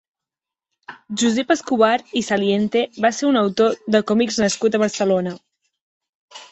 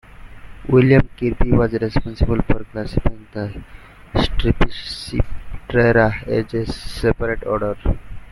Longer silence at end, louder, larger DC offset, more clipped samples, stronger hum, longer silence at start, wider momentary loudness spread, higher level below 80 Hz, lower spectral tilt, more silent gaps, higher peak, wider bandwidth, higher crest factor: about the same, 0.05 s vs 0 s; about the same, -19 LUFS vs -20 LUFS; neither; neither; neither; first, 0.9 s vs 0.2 s; second, 5 LU vs 14 LU; second, -60 dBFS vs -26 dBFS; second, -4.5 dB/octave vs -7.5 dB/octave; first, 5.81-6.01 s, 6.09-6.28 s vs none; about the same, -2 dBFS vs -2 dBFS; second, 8.2 kHz vs 12 kHz; about the same, 18 dB vs 16 dB